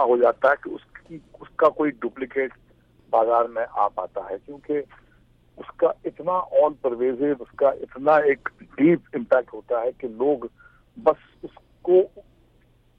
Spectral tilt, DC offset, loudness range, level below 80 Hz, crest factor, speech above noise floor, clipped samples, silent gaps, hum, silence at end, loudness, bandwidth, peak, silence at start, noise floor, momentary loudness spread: -8.5 dB/octave; under 0.1%; 4 LU; -60 dBFS; 16 dB; 36 dB; under 0.1%; none; none; 0.8 s; -23 LUFS; 5.2 kHz; -6 dBFS; 0 s; -59 dBFS; 19 LU